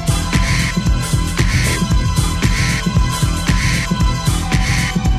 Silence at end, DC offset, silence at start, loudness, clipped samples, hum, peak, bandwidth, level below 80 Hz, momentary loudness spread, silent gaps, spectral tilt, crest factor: 0 s; under 0.1%; 0 s; -16 LUFS; under 0.1%; none; 0 dBFS; 15 kHz; -20 dBFS; 2 LU; none; -4.5 dB/octave; 14 dB